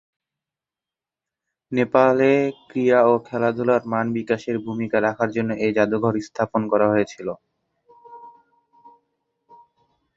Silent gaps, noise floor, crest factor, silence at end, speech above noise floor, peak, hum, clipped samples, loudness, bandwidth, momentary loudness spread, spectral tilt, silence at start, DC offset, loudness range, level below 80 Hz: none; -89 dBFS; 20 dB; 1.85 s; 69 dB; -2 dBFS; none; under 0.1%; -21 LUFS; 7.8 kHz; 9 LU; -7.5 dB/octave; 1.7 s; under 0.1%; 6 LU; -62 dBFS